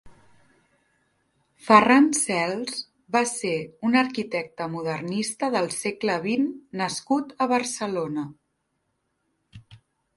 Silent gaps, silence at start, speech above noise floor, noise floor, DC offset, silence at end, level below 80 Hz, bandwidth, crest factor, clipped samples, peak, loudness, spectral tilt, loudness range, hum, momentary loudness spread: none; 0.05 s; 52 dB; -75 dBFS; under 0.1%; 0.4 s; -66 dBFS; 12 kHz; 24 dB; under 0.1%; -2 dBFS; -24 LUFS; -4 dB/octave; 7 LU; none; 13 LU